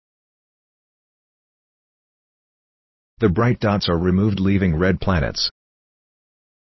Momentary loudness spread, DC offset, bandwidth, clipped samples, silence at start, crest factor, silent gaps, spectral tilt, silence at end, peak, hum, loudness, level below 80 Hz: 4 LU; under 0.1%; 6 kHz; under 0.1%; 3.2 s; 20 dB; none; -7 dB/octave; 1.25 s; -4 dBFS; none; -19 LUFS; -36 dBFS